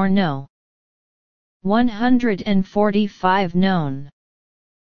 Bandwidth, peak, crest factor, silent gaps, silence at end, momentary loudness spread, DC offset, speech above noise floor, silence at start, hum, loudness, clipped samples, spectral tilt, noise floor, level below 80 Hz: 6.6 kHz; -2 dBFS; 18 dB; 0.50-1.60 s; 0.75 s; 10 LU; 3%; over 72 dB; 0 s; none; -19 LUFS; under 0.1%; -8 dB/octave; under -90 dBFS; -48 dBFS